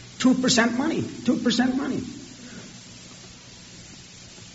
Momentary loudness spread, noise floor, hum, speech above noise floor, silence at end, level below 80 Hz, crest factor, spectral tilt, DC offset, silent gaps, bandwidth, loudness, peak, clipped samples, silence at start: 23 LU; -45 dBFS; none; 22 dB; 0 s; -56 dBFS; 20 dB; -3.5 dB/octave; under 0.1%; none; 8 kHz; -23 LUFS; -6 dBFS; under 0.1%; 0 s